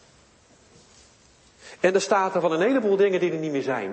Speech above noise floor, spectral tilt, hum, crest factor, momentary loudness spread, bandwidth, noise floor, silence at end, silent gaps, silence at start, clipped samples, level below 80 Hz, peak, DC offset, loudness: 34 dB; -5 dB/octave; none; 18 dB; 6 LU; 8.8 kHz; -56 dBFS; 0 s; none; 1.65 s; under 0.1%; -68 dBFS; -8 dBFS; under 0.1%; -23 LUFS